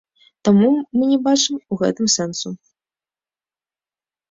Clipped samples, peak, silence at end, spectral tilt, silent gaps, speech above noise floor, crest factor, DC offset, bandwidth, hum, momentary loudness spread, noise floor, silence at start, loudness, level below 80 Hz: under 0.1%; -4 dBFS; 1.75 s; -4.5 dB/octave; none; over 73 dB; 16 dB; under 0.1%; 7.8 kHz; none; 12 LU; under -90 dBFS; 0.45 s; -18 LUFS; -62 dBFS